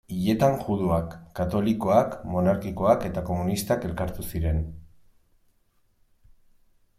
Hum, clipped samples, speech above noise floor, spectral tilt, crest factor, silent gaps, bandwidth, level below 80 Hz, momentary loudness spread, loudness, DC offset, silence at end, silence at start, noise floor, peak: none; under 0.1%; 41 dB; -7 dB/octave; 20 dB; none; 16 kHz; -42 dBFS; 9 LU; -25 LUFS; under 0.1%; 2.15 s; 0.1 s; -65 dBFS; -6 dBFS